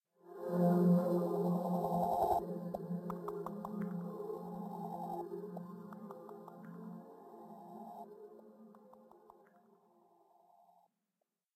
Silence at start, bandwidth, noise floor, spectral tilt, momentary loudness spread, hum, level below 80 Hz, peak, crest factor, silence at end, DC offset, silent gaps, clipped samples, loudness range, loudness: 0.25 s; 15 kHz; -88 dBFS; -9.5 dB/octave; 22 LU; none; -72 dBFS; -20 dBFS; 18 dB; 2.4 s; under 0.1%; none; under 0.1%; 21 LU; -37 LUFS